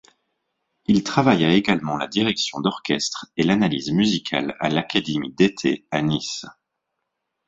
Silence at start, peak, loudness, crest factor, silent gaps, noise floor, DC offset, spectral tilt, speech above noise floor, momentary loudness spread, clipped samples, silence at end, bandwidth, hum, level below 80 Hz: 0.9 s; -2 dBFS; -21 LUFS; 22 dB; none; -79 dBFS; under 0.1%; -5 dB/octave; 58 dB; 7 LU; under 0.1%; 0.95 s; 7.8 kHz; none; -56 dBFS